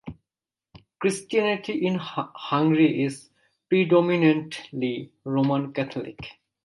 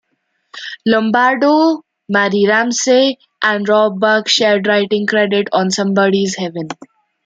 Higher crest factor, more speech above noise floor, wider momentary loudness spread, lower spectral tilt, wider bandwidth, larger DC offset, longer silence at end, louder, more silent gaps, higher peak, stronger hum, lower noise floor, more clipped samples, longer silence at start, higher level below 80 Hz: about the same, 18 dB vs 14 dB; first, over 66 dB vs 53 dB; first, 15 LU vs 10 LU; first, -6.5 dB/octave vs -4 dB/octave; first, 11.5 kHz vs 9.2 kHz; neither; second, 0.35 s vs 0.55 s; second, -24 LUFS vs -14 LUFS; neither; second, -6 dBFS vs 0 dBFS; neither; first, under -90 dBFS vs -67 dBFS; neither; second, 0.05 s vs 0.55 s; about the same, -64 dBFS vs -64 dBFS